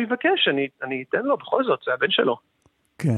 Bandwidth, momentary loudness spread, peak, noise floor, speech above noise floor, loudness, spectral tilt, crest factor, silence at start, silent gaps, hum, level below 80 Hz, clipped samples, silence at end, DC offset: 12 kHz; 8 LU; -4 dBFS; -45 dBFS; 22 dB; -23 LUFS; -6.5 dB/octave; 18 dB; 0 s; none; none; -72 dBFS; under 0.1%; 0 s; under 0.1%